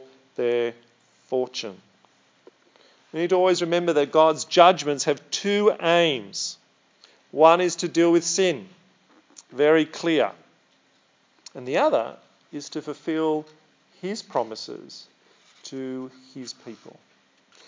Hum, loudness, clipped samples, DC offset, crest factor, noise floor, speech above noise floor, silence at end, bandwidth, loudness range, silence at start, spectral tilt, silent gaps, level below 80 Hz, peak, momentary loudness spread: none; -22 LUFS; under 0.1%; under 0.1%; 24 dB; -63 dBFS; 41 dB; 0.8 s; 7.6 kHz; 11 LU; 0 s; -4 dB/octave; none; -88 dBFS; 0 dBFS; 21 LU